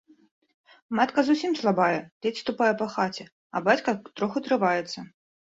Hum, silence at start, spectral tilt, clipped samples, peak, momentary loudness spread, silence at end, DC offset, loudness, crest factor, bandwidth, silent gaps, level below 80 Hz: none; 0.9 s; -5.5 dB/octave; under 0.1%; -8 dBFS; 9 LU; 0.5 s; under 0.1%; -26 LUFS; 20 dB; 8 kHz; 2.12-2.21 s, 3.32-3.50 s; -70 dBFS